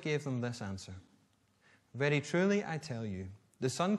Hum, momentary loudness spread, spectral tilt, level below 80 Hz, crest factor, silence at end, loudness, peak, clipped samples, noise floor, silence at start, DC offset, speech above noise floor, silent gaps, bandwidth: none; 19 LU; -5.5 dB/octave; -72 dBFS; 18 dB; 0 s; -35 LUFS; -18 dBFS; under 0.1%; -71 dBFS; 0 s; under 0.1%; 37 dB; none; 12.5 kHz